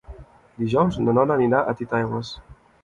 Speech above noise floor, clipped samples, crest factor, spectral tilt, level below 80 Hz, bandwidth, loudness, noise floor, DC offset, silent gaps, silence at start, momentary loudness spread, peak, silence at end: 22 dB; under 0.1%; 18 dB; -8 dB/octave; -48 dBFS; 7.8 kHz; -22 LUFS; -43 dBFS; under 0.1%; none; 0.1 s; 12 LU; -6 dBFS; 0.3 s